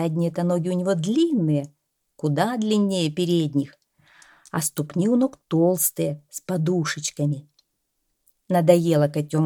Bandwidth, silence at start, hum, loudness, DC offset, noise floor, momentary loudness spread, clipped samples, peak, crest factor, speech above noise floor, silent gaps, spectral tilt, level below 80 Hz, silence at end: 18.5 kHz; 0 s; none; -23 LUFS; under 0.1%; -75 dBFS; 9 LU; under 0.1%; -2 dBFS; 20 dB; 53 dB; none; -6 dB/octave; -68 dBFS; 0 s